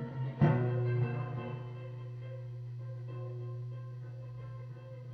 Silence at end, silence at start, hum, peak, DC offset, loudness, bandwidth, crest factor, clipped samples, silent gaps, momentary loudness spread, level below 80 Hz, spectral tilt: 0 s; 0 s; none; -16 dBFS; under 0.1%; -37 LUFS; 4.8 kHz; 20 dB; under 0.1%; none; 15 LU; -66 dBFS; -10.5 dB/octave